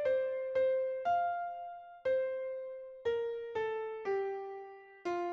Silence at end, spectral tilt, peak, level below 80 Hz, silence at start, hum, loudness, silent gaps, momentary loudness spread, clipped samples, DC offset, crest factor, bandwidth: 0 s; -5.5 dB/octave; -22 dBFS; -74 dBFS; 0 s; none; -36 LUFS; none; 13 LU; under 0.1%; under 0.1%; 12 dB; 6.8 kHz